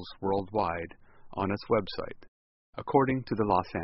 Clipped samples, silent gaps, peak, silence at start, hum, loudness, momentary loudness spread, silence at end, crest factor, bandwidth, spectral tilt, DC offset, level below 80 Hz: under 0.1%; 2.28-2.73 s; -8 dBFS; 0 s; none; -30 LUFS; 16 LU; 0 s; 22 dB; 5.8 kHz; -5.5 dB/octave; under 0.1%; -56 dBFS